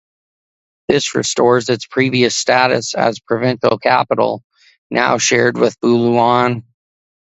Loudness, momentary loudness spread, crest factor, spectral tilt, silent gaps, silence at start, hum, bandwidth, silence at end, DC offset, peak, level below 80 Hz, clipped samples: -15 LUFS; 6 LU; 16 dB; -4 dB/octave; 4.44-4.50 s, 4.78-4.90 s; 0.9 s; none; 8.2 kHz; 0.8 s; under 0.1%; 0 dBFS; -56 dBFS; under 0.1%